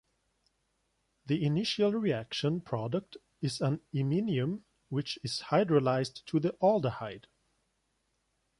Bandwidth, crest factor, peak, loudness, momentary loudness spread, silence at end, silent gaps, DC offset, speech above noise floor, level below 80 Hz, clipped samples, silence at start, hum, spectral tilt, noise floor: 11.5 kHz; 20 dB; -12 dBFS; -31 LUFS; 10 LU; 1.4 s; none; under 0.1%; 47 dB; -68 dBFS; under 0.1%; 1.25 s; none; -6.5 dB/octave; -78 dBFS